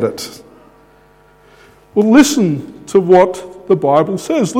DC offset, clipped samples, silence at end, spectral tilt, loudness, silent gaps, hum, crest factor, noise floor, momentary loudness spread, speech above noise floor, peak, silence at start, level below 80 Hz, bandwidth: under 0.1%; under 0.1%; 0 s; -5.5 dB/octave; -13 LUFS; none; none; 14 dB; -47 dBFS; 15 LU; 35 dB; 0 dBFS; 0 s; -50 dBFS; 16.5 kHz